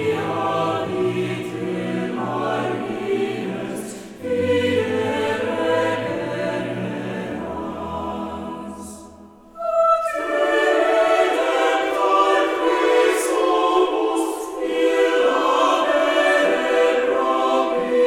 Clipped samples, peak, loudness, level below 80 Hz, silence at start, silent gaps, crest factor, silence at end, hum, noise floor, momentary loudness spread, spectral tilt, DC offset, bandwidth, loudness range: under 0.1%; -6 dBFS; -20 LUFS; -56 dBFS; 0 s; none; 14 dB; 0 s; none; -44 dBFS; 11 LU; -4.5 dB/octave; under 0.1%; 16.5 kHz; 7 LU